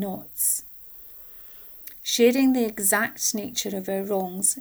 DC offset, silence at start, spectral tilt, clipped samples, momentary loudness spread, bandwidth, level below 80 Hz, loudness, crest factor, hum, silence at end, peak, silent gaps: under 0.1%; 0 s; -2.5 dB/octave; under 0.1%; 18 LU; over 20 kHz; -62 dBFS; -23 LUFS; 18 dB; none; 0 s; -8 dBFS; none